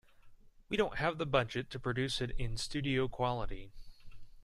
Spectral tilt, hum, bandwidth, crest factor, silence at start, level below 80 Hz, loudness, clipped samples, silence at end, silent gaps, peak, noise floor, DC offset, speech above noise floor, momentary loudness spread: -5 dB/octave; none; 12.5 kHz; 20 dB; 0.25 s; -48 dBFS; -36 LUFS; under 0.1%; 0 s; none; -16 dBFS; -57 dBFS; under 0.1%; 22 dB; 7 LU